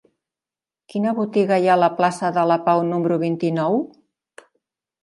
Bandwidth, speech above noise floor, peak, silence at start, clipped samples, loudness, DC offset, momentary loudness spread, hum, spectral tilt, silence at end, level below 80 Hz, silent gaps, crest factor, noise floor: 11.5 kHz; over 71 dB; -2 dBFS; 0.95 s; under 0.1%; -20 LUFS; under 0.1%; 7 LU; none; -7 dB/octave; 1.15 s; -72 dBFS; none; 18 dB; under -90 dBFS